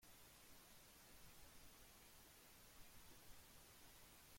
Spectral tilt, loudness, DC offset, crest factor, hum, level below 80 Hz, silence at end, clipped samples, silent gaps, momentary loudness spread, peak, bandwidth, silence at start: -2 dB/octave; -65 LUFS; under 0.1%; 16 dB; none; -74 dBFS; 0 s; under 0.1%; none; 0 LU; -50 dBFS; 16.5 kHz; 0 s